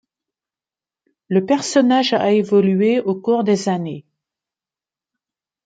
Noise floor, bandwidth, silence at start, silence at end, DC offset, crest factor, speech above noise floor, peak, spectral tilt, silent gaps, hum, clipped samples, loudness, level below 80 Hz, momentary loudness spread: under -90 dBFS; 9.2 kHz; 1.3 s; 1.65 s; under 0.1%; 16 dB; over 74 dB; -2 dBFS; -5.5 dB/octave; none; none; under 0.1%; -17 LUFS; -68 dBFS; 8 LU